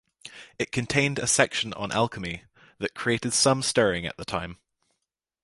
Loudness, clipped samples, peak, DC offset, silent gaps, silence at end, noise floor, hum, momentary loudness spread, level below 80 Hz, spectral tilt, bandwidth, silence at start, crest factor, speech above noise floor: -25 LUFS; under 0.1%; -2 dBFS; under 0.1%; none; 0.9 s; -83 dBFS; none; 17 LU; -54 dBFS; -3 dB/octave; 11.5 kHz; 0.25 s; 24 dB; 57 dB